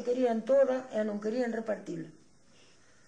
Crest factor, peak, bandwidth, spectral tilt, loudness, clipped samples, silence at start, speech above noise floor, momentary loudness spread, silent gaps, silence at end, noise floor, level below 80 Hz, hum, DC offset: 14 dB; -18 dBFS; 9.4 kHz; -6.5 dB/octave; -31 LUFS; under 0.1%; 0 s; 33 dB; 15 LU; none; 0.95 s; -63 dBFS; -76 dBFS; none; under 0.1%